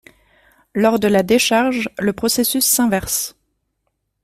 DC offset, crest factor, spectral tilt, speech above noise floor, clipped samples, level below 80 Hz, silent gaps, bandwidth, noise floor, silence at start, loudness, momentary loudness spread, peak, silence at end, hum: under 0.1%; 16 dB; -3 dB/octave; 55 dB; under 0.1%; -50 dBFS; none; 16 kHz; -72 dBFS; 0.75 s; -16 LUFS; 7 LU; -2 dBFS; 0.95 s; none